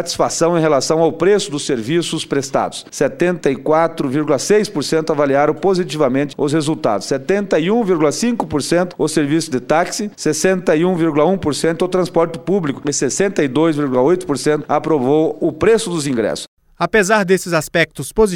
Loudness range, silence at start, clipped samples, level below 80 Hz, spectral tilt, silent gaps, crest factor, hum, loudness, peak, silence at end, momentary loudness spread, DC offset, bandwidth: 1 LU; 0 s; under 0.1%; -46 dBFS; -5 dB/octave; 16.48-16.57 s; 14 dB; none; -16 LUFS; 0 dBFS; 0 s; 5 LU; under 0.1%; 16.5 kHz